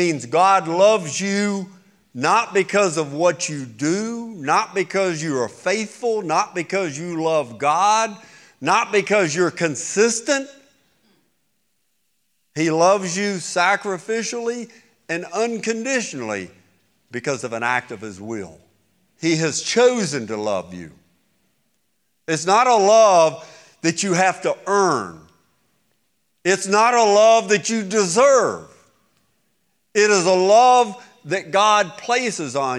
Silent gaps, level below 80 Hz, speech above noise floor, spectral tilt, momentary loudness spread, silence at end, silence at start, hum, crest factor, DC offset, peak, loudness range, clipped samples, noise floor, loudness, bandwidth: none; -74 dBFS; 52 dB; -3.5 dB/octave; 14 LU; 0 s; 0 s; none; 16 dB; under 0.1%; -4 dBFS; 7 LU; under 0.1%; -71 dBFS; -19 LUFS; 12.5 kHz